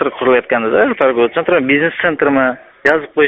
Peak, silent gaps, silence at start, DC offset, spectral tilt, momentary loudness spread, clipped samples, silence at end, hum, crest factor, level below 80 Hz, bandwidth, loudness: 0 dBFS; none; 0 s; under 0.1%; -3 dB/octave; 3 LU; under 0.1%; 0 s; none; 14 dB; -52 dBFS; 7 kHz; -13 LUFS